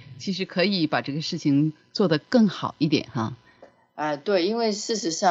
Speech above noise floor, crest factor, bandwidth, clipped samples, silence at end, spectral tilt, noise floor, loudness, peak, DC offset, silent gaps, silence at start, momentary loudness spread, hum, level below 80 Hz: 30 dB; 18 dB; 8 kHz; under 0.1%; 0 s; -5 dB/octave; -53 dBFS; -24 LUFS; -6 dBFS; under 0.1%; none; 0 s; 10 LU; none; -68 dBFS